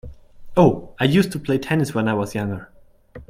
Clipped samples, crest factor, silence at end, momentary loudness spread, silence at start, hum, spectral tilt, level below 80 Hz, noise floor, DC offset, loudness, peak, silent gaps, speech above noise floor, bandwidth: under 0.1%; 20 dB; 0.05 s; 10 LU; 0.05 s; none; -6.5 dB/octave; -46 dBFS; -43 dBFS; under 0.1%; -20 LUFS; -2 dBFS; none; 24 dB; 16 kHz